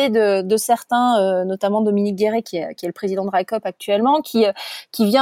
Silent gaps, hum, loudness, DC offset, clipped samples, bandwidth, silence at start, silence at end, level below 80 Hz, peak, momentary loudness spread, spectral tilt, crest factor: none; none; -19 LUFS; under 0.1%; under 0.1%; 16.5 kHz; 0 s; 0 s; -72 dBFS; -4 dBFS; 9 LU; -5 dB/octave; 16 dB